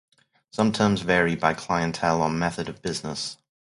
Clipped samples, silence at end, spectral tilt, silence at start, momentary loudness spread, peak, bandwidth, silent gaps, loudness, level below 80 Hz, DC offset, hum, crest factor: under 0.1%; 0.4 s; -5 dB/octave; 0.55 s; 10 LU; -4 dBFS; 11.5 kHz; none; -24 LUFS; -52 dBFS; under 0.1%; none; 22 dB